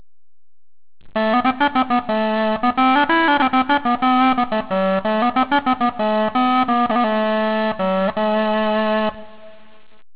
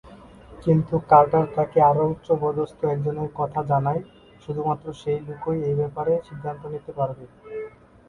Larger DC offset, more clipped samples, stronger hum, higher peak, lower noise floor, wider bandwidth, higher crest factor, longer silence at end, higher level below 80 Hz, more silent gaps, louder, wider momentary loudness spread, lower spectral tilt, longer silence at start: first, 1% vs under 0.1%; neither; neither; about the same, -2 dBFS vs -2 dBFS; about the same, -45 dBFS vs -45 dBFS; second, 4 kHz vs 7 kHz; second, 16 dB vs 22 dB; first, 0.65 s vs 0.4 s; about the same, -52 dBFS vs -54 dBFS; neither; first, -18 LUFS vs -23 LUFS; second, 5 LU vs 16 LU; about the same, -9 dB/octave vs -9.5 dB/octave; first, 1.05 s vs 0.05 s